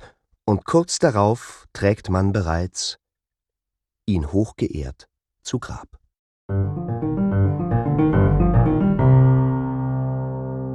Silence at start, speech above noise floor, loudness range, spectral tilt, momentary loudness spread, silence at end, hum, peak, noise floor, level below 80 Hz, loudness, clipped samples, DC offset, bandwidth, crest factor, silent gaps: 0 s; 65 dB; 9 LU; -7 dB/octave; 12 LU; 0 s; none; -2 dBFS; -86 dBFS; -34 dBFS; -21 LUFS; under 0.1%; under 0.1%; 10.5 kHz; 18 dB; 6.19-6.49 s